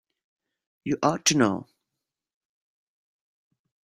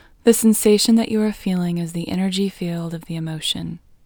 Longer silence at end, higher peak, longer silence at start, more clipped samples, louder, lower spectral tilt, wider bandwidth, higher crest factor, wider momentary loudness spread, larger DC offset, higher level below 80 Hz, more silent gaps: first, 2.2 s vs 0.3 s; second, -6 dBFS vs 0 dBFS; first, 0.85 s vs 0.25 s; neither; second, -24 LUFS vs -19 LUFS; second, -3.5 dB/octave vs -5 dB/octave; second, 15.5 kHz vs over 20 kHz; about the same, 24 dB vs 20 dB; about the same, 14 LU vs 13 LU; neither; second, -66 dBFS vs -52 dBFS; neither